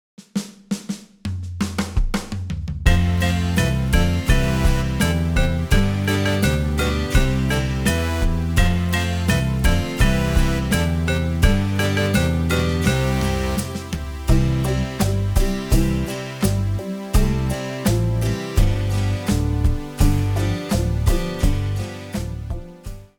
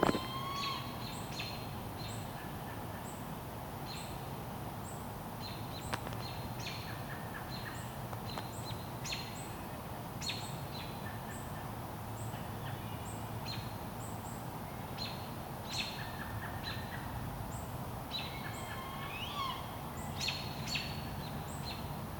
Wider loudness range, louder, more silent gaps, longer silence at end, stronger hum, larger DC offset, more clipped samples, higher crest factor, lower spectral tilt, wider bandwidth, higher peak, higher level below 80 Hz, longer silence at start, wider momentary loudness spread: about the same, 2 LU vs 3 LU; first, -21 LUFS vs -41 LUFS; neither; first, 0.15 s vs 0 s; neither; neither; neither; second, 16 dB vs 28 dB; about the same, -5.5 dB/octave vs -4.5 dB/octave; about the same, over 20 kHz vs 19 kHz; first, -2 dBFS vs -12 dBFS; first, -24 dBFS vs -54 dBFS; first, 0.2 s vs 0 s; first, 9 LU vs 6 LU